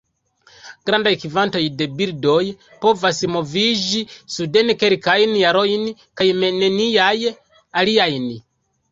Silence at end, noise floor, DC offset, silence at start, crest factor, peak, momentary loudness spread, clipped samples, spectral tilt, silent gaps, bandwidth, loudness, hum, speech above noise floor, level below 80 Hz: 0.5 s; -55 dBFS; under 0.1%; 0.65 s; 18 dB; 0 dBFS; 10 LU; under 0.1%; -4 dB/octave; none; 7.8 kHz; -18 LUFS; none; 38 dB; -58 dBFS